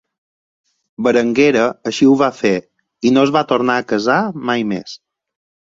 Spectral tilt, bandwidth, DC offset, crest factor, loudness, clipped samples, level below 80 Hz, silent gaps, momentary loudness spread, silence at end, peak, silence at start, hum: -5.5 dB/octave; 7.8 kHz; under 0.1%; 16 dB; -15 LUFS; under 0.1%; -58 dBFS; none; 9 LU; 0.8 s; -2 dBFS; 1 s; none